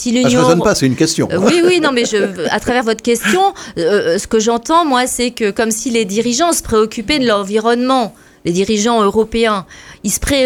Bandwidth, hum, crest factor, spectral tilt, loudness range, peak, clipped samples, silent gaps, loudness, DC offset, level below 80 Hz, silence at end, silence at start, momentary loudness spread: 18.5 kHz; none; 14 dB; -4 dB/octave; 2 LU; 0 dBFS; under 0.1%; none; -14 LUFS; under 0.1%; -38 dBFS; 0 s; 0 s; 5 LU